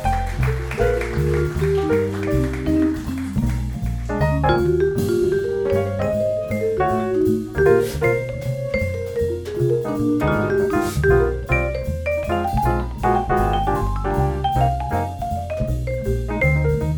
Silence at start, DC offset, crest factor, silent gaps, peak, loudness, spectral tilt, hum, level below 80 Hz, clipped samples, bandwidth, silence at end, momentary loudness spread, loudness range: 0 s; under 0.1%; 16 dB; none; -4 dBFS; -21 LUFS; -7.5 dB/octave; none; -28 dBFS; under 0.1%; over 20 kHz; 0 s; 6 LU; 2 LU